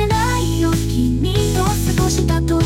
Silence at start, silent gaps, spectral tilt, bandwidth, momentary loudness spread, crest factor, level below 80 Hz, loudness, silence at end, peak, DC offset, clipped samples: 0 s; none; -5.5 dB/octave; 17 kHz; 1 LU; 12 dB; -24 dBFS; -17 LUFS; 0 s; -4 dBFS; under 0.1%; under 0.1%